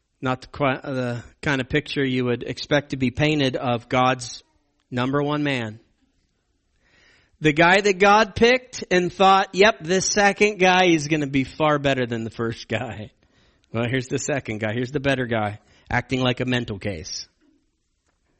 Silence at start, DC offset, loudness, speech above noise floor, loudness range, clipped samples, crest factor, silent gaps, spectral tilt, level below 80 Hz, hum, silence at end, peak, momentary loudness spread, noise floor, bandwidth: 0.2 s; under 0.1%; -21 LUFS; 49 dB; 9 LU; under 0.1%; 18 dB; none; -4.5 dB/octave; -50 dBFS; none; 1.15 s; -4 dBFS; 13 LU; -70 dBFS; 8.8 kHz